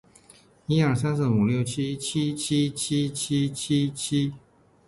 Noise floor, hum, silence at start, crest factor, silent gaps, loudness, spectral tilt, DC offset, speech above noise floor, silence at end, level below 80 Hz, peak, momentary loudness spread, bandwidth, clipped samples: -55 dBFS; none; 0.7 s; 16 dB; none; -25 LUFS; -5.5 dB/octave; under 0.1%; 31 dB; 0.5 s; -56 dBFS; -10 dBFS; 5 LU; 11.5 kHz; under 0.1%